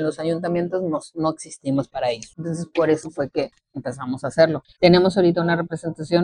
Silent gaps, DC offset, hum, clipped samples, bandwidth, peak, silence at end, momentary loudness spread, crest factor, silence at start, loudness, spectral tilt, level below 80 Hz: none; under 0.1%; none; under 0.1%; 10.5 kHz; -2 dBFS; 0 s; 14 LU; 20 dB; 0 s; -22 LUFS; -6.5 dB/octave; -56 dBFS